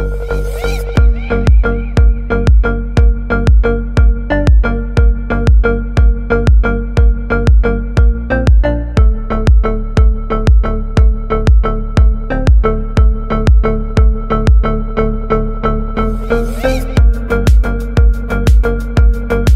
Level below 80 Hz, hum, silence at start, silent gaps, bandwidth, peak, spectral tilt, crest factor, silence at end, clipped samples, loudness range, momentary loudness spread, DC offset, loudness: -12 dBFS; none; 0 s; none; 7.6 kHz; 0 dBFS; -8 dB/octave; 10 dB; 0 s; under 0.1%; 2 LU; 5 LU; under 0.1%; -13 LUFS